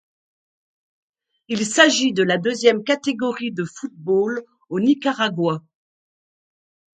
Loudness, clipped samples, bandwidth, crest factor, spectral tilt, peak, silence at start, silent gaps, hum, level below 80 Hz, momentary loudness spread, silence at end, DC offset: -20 LUFS; under 0.1%; 9.4 kHz; 22 dB; -4 dB/octave; 0 dBFS; 1.5 s; none; none; -70 dBFS; 14 LU; 1.4 s; under 0.1%